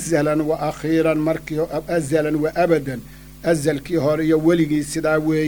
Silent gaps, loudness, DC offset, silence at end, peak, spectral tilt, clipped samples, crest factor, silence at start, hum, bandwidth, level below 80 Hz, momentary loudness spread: none; -20 LUFS; under 0.1%; 0 s; -4 dBFS; -6 dB/octave; under 0.1%; 16 dB; 0 s; none; over 20 kHz; -44 dBFS; 6 LU